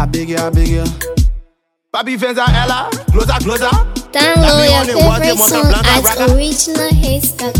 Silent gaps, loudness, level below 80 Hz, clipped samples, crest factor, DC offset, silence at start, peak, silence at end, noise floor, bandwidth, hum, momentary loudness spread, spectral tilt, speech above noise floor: none; -12 LUFS; -18 dBFS; under 0.1%; 12 dB; under 0.1%; 0 s; 0 dBFS; 0 s; -54 dBFS; 19.5 kHz; none; 8 LU; -4 dB/octave; 43 dB